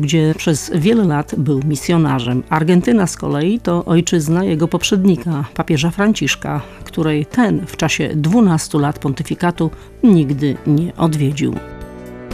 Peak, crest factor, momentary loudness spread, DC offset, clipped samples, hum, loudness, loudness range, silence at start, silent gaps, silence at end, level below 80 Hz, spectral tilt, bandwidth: -2 dBFS; 14 dB; 8 LU; under 0.1%; under 0.1%; none; -16 LUFS; 2 LU; 0 s; none; 0 s; -40 dBFS; -6 dB/octave; 15 kHz